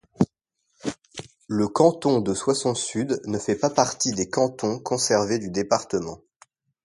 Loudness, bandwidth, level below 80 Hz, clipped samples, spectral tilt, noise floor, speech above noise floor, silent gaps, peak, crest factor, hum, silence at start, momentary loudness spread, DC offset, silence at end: -24 LUFS; 11.5 kHz; -58 dBFS; under 0.1%; -4.5 dB/octave; -74 dBFS; 51 dB; none; -2 dBFS; 22 dB; none; 0.2 s; 14 LU; under 0.1%; 0.7 s